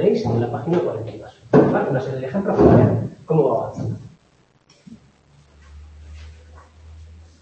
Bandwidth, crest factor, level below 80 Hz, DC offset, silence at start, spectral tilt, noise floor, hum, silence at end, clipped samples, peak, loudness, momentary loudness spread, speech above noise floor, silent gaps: 8.2 kHz; 20 dB; -44 dBFS; under 0.1%; 0 s; -9.5 dB/octave; -58 dBFS; none; 0.25 s; under 0.1%; 0 dBFS; -19 LUFS; 21 LU; 39 dB; none